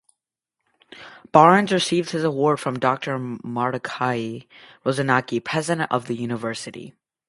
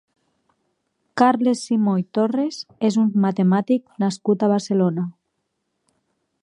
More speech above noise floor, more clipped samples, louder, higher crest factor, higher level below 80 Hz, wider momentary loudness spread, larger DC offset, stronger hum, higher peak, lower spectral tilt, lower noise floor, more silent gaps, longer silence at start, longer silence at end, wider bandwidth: first, 62 dB vs 56 dB; neither; about the same, -21 LUFS vs -20 LUFS; about the same, 22 dB vs 20 dB; first, -66 dBFS vs -74 dBFS; first, 17 LU vs 6 LU; neither; neither; about the same, 0 dBFS vs -2 dBFS; second, -5 dB/octave vs -7 dB/octave; first, -83 dBFS vs -75 dBFS; neither; second, 0.95 s vs 1.15 s; second, 0.4 s vs 1.3 s; about the same, 11.5 kHz vs 10.5 kHz